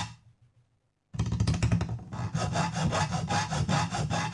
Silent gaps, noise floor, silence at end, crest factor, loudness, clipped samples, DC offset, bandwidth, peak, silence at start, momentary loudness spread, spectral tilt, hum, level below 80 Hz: none; -73 dBFS; 0 s; 16 dB; -30 LUFS; under 0.1%; under 0.1%; 11.5 kHz; -14 dBFS; 0 s; 7 LU; -5 dB/octave; none; -44 dBFS